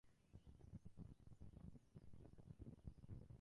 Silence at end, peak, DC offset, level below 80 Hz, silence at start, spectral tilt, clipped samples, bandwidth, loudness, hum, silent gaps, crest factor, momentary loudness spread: 0 s; -42 dBFS; under 0.1%; -68 dBFS; 0.05 s; -8.5 dB/octave; under 0.1%; 10.5 kHz; -63 LUFS; none; none; 20 dB; 6 LU